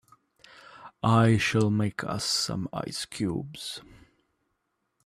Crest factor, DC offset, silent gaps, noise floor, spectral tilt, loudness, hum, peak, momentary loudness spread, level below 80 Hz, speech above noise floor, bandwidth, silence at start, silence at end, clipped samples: 20 dB; under 0.1%; none; -78 dBFS; -5 dB/octave; -27 LUFS; none; -8 dBFS; 15 LU; -58 dBFS; 51 dB; 14.5 kHz; 0.75 s; 1.25 s; under 0.1%